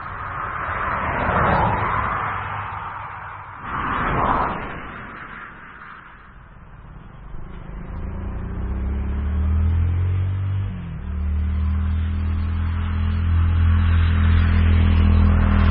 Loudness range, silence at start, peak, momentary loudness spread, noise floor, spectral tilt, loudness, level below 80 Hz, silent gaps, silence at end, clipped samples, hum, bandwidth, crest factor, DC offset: 15 LU; 0 s; -4 dBFS; 19 LU; -43 dBFS; -12 dB/octave; -22 LUFS; -26 dBFS; none; 0 s; under 0.1%; none; 4.2 kHz; 16 dB; under 0.1%